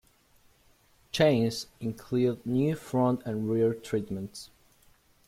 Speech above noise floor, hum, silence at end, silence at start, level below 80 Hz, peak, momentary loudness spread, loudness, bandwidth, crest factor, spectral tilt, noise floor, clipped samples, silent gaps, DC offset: 35 dB; none; 0.8 s; 1.15 s; -62 dBFS; -10 dBFS; 13 LU; -29 LUFS; 15.5 kHz; 20 dB; -6.5 dB/octave; -63 dBFS; under 0.1%; none; under 0.1%